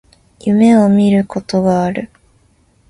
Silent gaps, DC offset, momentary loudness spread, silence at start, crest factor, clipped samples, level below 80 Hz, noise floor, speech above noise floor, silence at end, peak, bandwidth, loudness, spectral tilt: none; under 0.1%; 14 LU; 0.45 s; 14 dB; under 0.1%; -48 dBFS; -53 dBFS; 42 dB; 0.85 s; 0 dBFS; 11 kHz; -13 LUFS; -7.5 dB/octave